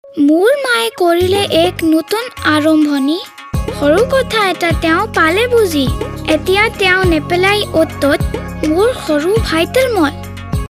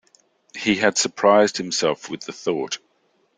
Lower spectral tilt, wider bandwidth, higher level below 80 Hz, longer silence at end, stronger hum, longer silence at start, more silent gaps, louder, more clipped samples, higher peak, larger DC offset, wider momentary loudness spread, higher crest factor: first, -5 dB/octave vs -3 dB/octave; first, 16 kHz vs 9.8 kHz; first, -30 dBFS vs -64 dBFS; second, 0.05 s vs 0.6 s; neither; second, 0.05 s vs 0.55 s; neither; first, -13 LUFS vs -20 LUFS; neither; about the same, 0 dBFS vs -2 dBFS; neither; second, 8 LU vs 15 LU; second, 12 dB vs 20 dB